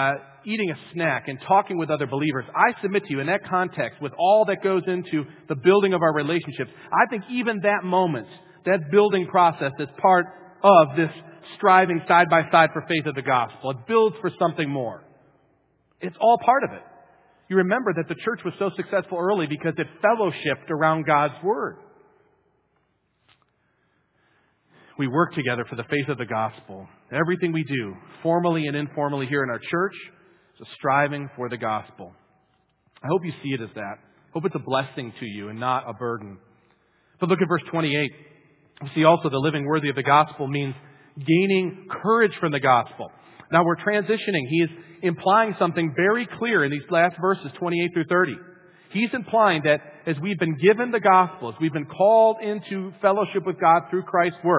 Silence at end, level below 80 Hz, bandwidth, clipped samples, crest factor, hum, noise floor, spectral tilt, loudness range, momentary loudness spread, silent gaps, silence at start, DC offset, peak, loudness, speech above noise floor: 0 s; -68 dBFS; 4 kHz; under 0.1%; 22 dB; none; -69 dBFS; -10 dB/octave; 9 LU; 12 LU; none; 0 s; under 0.1%; -2 dBFS; -22 LUFS; 47 dB